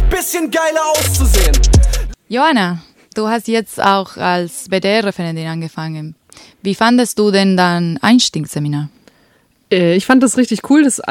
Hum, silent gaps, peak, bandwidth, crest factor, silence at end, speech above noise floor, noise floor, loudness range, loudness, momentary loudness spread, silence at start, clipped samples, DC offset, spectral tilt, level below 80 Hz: none; none; 0 dBFS; 18 kHz; 14 dB; 0 s; 41 dB; -54 dBFS; 3 LU; -14 LUFS; 12 LU; 0 s; under 0.1%; under 0.1%; -4.5 dB/octave; -20 dBFS